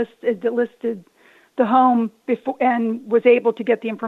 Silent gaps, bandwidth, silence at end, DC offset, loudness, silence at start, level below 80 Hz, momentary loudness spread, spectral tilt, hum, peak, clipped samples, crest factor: none; 4.2 kHz; 0 s; under 0.1%; -19 LUFS; 0 s; -74 dBFS; 11 LU; -7.5 dB/octave; none; -4 dBFS; under 0.1%; 16 dB